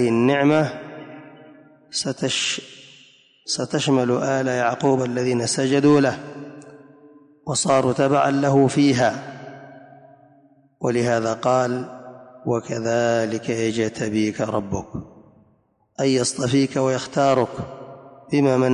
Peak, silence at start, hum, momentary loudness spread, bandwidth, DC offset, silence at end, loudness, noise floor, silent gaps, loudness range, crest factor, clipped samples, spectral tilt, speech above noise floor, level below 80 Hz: -6 dBFS; 0 s; none; 20 LU; 11 kHz; under 0.1%; 0 s; -21 LUFS; -62 dBFS; none; 5 LU; 16 dB; under 0.1%; -5 dB/octave; 42 dB; -56 dBFS